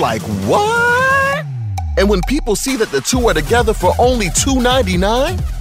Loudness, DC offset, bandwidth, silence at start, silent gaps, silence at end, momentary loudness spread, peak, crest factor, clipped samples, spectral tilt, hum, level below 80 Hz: -14 LUFS; under 0.1%; 16 kHz; 0 s; none; 0 s; 6 LU; -2 dBFS; 12 dB; under 0.1%; -4 dB/octave; none; -24 dBFS